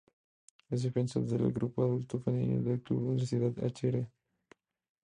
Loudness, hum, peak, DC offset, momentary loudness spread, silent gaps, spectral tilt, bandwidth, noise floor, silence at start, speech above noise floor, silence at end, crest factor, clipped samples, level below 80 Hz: -33 LUFS; none; -18 dBFS; under 0.1%; 3 LU; none; -8.5 dB/octave; 10 kHz; -66 dBFS; 0.7 s; 34 dB; 0.95 s; 16 dB; under 0.1%; -64 dBFS